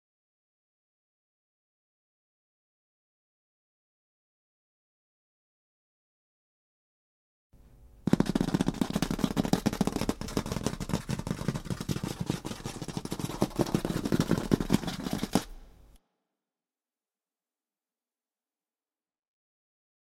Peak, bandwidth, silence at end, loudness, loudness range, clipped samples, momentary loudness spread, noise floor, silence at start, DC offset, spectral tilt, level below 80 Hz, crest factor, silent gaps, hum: -6 dBFS; 16.5 kHz; 4.15 s; -31 LUFS; 6 LU; under 0.1%; 8 LU; under -90 dBFS; 7.8 s; under 0.1%; -6 dB/octave; -50 dBFS; 28 dB; none; none